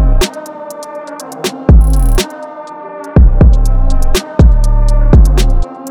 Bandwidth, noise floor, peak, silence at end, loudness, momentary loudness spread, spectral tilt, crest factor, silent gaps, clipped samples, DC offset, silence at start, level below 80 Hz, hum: 16.5 kHz; -27 dBFS; 0 dBFS; 0 s; -11 LUFS; 17 LU; -6 dB/octave; 8 dB; none; under 0.1%; under 0.1%; 0 s; -10 dBFS; none